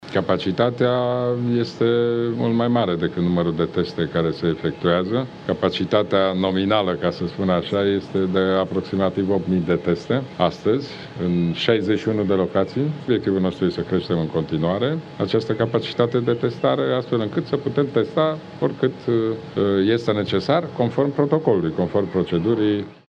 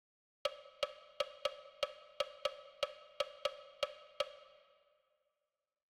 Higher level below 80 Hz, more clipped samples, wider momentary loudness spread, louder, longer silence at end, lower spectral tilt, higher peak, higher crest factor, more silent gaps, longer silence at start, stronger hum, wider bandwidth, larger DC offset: first, -54 dBFS vs -76 dBFS; neither; about the same, 4 LU vs 3 LU; first, -21 LUFS vs -43 LUFS; second, 0.15 s vs 1.4 s; first, -8 dB/octave vs 0 dB/octave; first, -4 dBFS vs -22 dBFS; second, 18 dB vs 24 dB; neither; second, 0 s vs 0.45 s; neither; second, 8 kHz vs over 20 kHz; neither